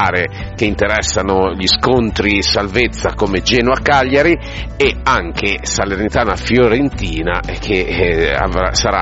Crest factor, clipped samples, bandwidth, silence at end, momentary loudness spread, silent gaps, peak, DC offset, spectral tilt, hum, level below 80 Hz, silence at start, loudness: 14 dB; under 0.1%; 8 kHz; 0 s; 6 LU; none; 0 dBFS; under 0.1%; -4 dB/octave; none; -26 dBFS; 0 s; -14 LUFS